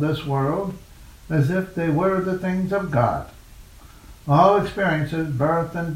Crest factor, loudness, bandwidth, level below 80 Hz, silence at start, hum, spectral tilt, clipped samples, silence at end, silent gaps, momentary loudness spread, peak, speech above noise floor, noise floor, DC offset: 20 dB; -22 LUFS; 15.5 kHz; -46 dBFS; 0 s; none; -8 dB/octave; under 0.1%; 0 s; none; 11 LU; -2 dBFS; 23 dB; -44 dBFS; under 0.1%